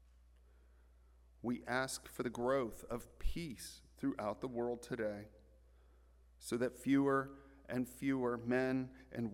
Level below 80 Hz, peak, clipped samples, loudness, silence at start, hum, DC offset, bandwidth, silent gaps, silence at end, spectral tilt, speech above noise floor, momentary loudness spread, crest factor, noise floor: -56 dBFS; -22 dBFS; under 0.1%; -40 LUFS; 1.45 s; none; under 0.1%; 17 kHz; none; 0 s; -5.5 dB/octave; 26 dB; 12 LU; 18 dB; -65 dBFS